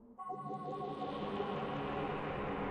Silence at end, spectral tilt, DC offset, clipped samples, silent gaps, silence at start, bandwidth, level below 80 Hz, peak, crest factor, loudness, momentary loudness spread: 0 s; -7.5 dB/octave; under 0.1%; under 0.1%; none; 0 s; 9.6 kHz; -60 dBFS; -26 dBFS; 14 dB; -41 LUFS; 4 LU